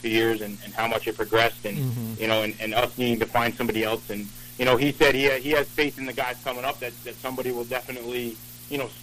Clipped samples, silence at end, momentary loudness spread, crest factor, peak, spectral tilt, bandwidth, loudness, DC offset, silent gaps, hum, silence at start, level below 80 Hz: under 0.1%; 0 s; 12 LU; 20 dB; -4 dBFS; -4.5 dB/octave; 15.5 kHz; -25 LUFS; under 0.1%; none; 60 Hz at -50 dBFS; 0 s; -50 dBFS